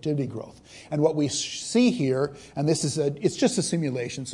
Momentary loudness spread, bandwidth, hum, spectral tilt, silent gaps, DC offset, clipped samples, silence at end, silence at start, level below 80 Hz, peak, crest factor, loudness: 9 LU; 11.5 kHz; none; -5 dB/octave; none; under 0.1%; under 0.1%; 0 s; 0.05 s; -62 dBFS; -8 dBFS; 18 dB; -25 LUFS